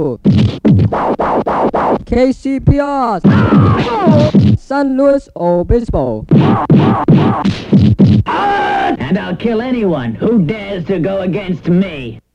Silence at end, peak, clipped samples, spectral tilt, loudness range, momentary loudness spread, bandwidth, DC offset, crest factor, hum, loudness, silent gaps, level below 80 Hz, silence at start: 0.15 s; 0 dBFS; under 0.1%; -9 dB/octave; 4 LU; 7 LU; 8.6 kHz; under 0.1%; 12 dB; none; -12 LUFS; none; -30 dBFS; 0 s